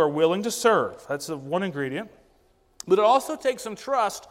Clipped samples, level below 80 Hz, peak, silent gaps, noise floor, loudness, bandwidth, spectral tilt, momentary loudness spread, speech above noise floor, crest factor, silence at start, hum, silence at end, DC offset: under 0.1%; -66 dBFS; -6 dBFS; none; -62 dBFS; -24 LUFS; 16 kHz; -4.5 dB/octave; 12 LU; 38 dB; 18 dB; 0 s; none; 0.05 s; under 0.1%